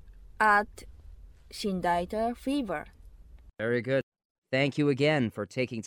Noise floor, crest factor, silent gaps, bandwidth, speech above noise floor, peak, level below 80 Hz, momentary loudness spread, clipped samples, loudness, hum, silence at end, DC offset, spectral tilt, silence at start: -51 dBFS; 18 dB; 4.03-4.12 s, 4.25-4.42 s; 17.5 kHz; 23 dB; -12 dBFS; -54 dBFS; 13 LU; under 0.1%; -29 LUFS; none; 0 s; under 0.1%; -6 dB/octave; 0.05 s